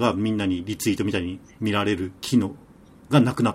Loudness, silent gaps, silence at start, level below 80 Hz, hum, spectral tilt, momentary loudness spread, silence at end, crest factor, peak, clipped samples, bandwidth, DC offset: -24 LUFS; none; 0 s; -54 dBFS; none; -6 dB/octave; 8 LU; 0 s; 20 dB; -4 dBFS; under 0.1%; 16 kHz; under 0.1%